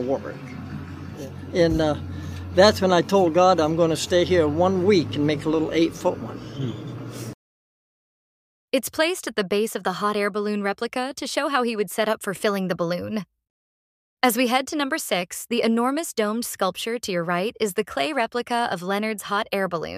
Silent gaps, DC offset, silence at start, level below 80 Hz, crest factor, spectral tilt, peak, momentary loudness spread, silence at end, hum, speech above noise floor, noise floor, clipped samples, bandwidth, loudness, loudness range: 7.34-8.68 s, 13.50-14.17 s; under 0.1%; 0 s; -52 dBFS; 22 dB; -4.5 dB/octave; -2 dBFS; 15 LU; 0 s; none; over 67 dB; under -90 dBFS; under 0.1%; 15.5 kHz; -23 LUFS; 8 LU